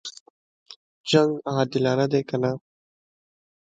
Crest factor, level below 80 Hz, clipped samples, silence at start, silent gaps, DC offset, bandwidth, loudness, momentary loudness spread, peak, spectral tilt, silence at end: 22 dB; -66 dBFS; under 0.1%; 0.05 s; 0.20-0.66 s, 0.76-1.04 s; under 0.1%; 9.2 kHz; -23 LUFS; 16 LU; -4 dBFS; -6 dB/octave; 1.1 s